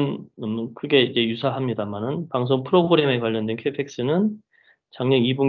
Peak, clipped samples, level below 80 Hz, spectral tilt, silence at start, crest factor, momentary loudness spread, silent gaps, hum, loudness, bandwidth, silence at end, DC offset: -4 dBFS; under 0.1%; -64 dBFS; -7 dB/octave; 0 s; 18 dB; 10 LU; none; none; -22 LUFS; 6.8 kHz; 0 s; under 0.1%